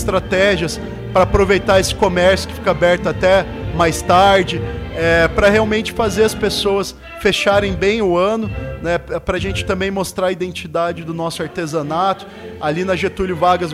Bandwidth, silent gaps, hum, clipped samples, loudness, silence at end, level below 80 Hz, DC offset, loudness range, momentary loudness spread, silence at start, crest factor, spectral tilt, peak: 16 kHz; none; none; under 0.1%; -16 LUFS; 0 s; -32 dBFS; under 0.1%; 6 LU; 10 LU; 0 s; 14 dB; -5 dB/octave; -4 dBFS